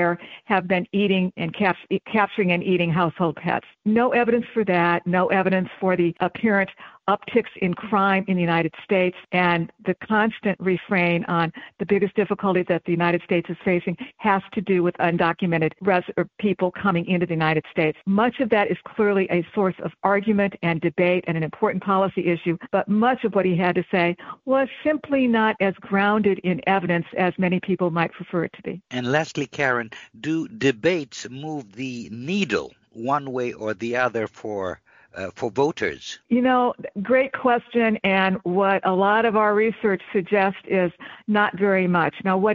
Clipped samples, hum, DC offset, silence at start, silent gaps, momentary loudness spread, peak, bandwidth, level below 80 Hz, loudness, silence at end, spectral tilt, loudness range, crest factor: under 0.1%; none; under 0.1%; 0 s; none; 8 LU; -4 dBFS; 7.4 kHz; -60 dBFS; -22 LUFS; 0 s; -5 dB/octave; 5 LU; 18 dB